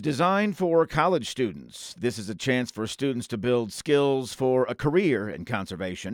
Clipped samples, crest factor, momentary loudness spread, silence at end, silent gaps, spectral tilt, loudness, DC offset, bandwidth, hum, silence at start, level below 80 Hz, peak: under 0.1%; 18 dB; 9 LU; 0 s; none; -5.5 dB/octave; -26 LUFS; under 0.1%; 17 kHz; none; 0 s; -56 dBFS; -8 dBFS